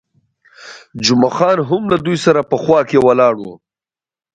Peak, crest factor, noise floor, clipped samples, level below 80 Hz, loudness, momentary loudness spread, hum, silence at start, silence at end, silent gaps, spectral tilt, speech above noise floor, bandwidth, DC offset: 0 dBFS; 16 dB; under -90 dBFS; under 0.1%; -52 dBFS; -14 LUFS; 8 LU; none; 0.6 s; 0.8 s; none; -5.5 dB/octave; over 77 dB; 9.2 kHz; under 0.1%